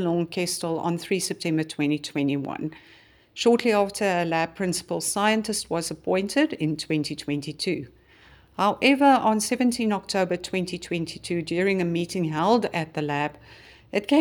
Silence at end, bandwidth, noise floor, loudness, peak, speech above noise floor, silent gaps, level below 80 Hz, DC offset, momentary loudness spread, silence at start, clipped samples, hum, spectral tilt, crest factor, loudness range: 0 s; over 20 kHz; -53 dBFS; -25 LUFS; -6 dBFS; 29 dB; none; -60 dBFS; under 0.1%; 9 LU; 0 s; under 0.1%; none; -4.5 dB/octave; 20 dB; 4 LU